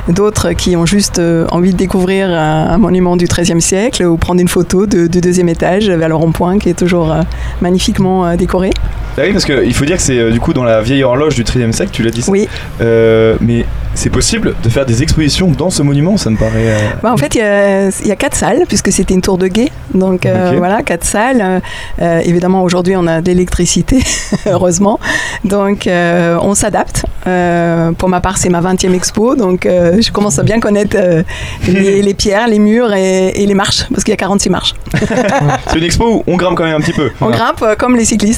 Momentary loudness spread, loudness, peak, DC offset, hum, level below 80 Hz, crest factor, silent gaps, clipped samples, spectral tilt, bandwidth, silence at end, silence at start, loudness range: 4 LU; -11 LUFS; 0 dBFS; under 0.1%; none; -24 dBFS; 10 dB; none; under 0.1%; -5 dB/octave; 15.5 kHz; 0 s; 0 s; 1 LU